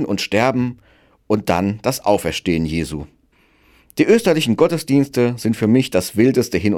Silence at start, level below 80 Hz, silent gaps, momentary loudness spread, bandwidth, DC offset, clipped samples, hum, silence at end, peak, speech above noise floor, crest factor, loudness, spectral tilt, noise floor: 0 s; -42 dBFS; none; 7 LU; 16 kHz; under 0.1%; under 0.1%; none; 0 s; -2 dBFS; 40 dB; 16 dB; -17 LUFS; -5.5 dB/octave; -57 dBFS